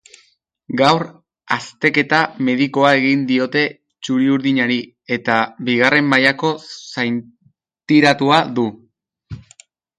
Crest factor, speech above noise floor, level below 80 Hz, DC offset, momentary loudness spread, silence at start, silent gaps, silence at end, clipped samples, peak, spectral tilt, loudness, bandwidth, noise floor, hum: 18 dB; 43 dB; -58 dBFS; under 0.1%; 13 LU; 0.7 s; none; 0.6 s; under 0.1%; 0 dBFS; -5.5 dB/octave; -16 LUFS; 10.5 kHz; -59 dBFS; none